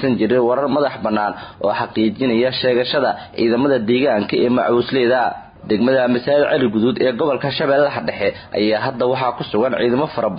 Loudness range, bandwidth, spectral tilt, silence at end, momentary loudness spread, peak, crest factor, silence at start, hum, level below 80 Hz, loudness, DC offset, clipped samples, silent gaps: 2 LU; 5.2 kHz; -11 dB/octave; 0 s; 5 LU; -4 dBFS; 12 dB; 0 s; none; -52 dBFS; -17 LUFS; under 0.1%; under 0.1%; none